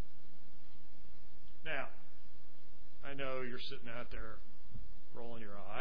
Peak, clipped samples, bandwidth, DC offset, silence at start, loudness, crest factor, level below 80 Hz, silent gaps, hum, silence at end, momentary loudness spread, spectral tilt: -22 dBFS; under 0.1%; 5.4 kHz; 4%; 0 s; -47 LUFS; 22 dB; -58 dBFS; none; none; 0 s; 23 LU; -7 dB/octave